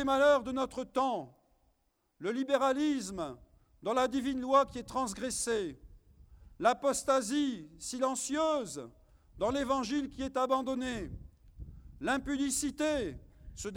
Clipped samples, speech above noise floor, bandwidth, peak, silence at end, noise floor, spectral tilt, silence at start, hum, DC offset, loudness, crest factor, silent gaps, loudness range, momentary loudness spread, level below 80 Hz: under 0.1%; 44 dB; 17 kHz; -14 dBFS; 0 s; -76 dBFS; -3.5 dB/octave; 0 s; none; under 0.1%; -32 LUFS; 20 dB; none; 3 LU; 14 LU; -56 dBFS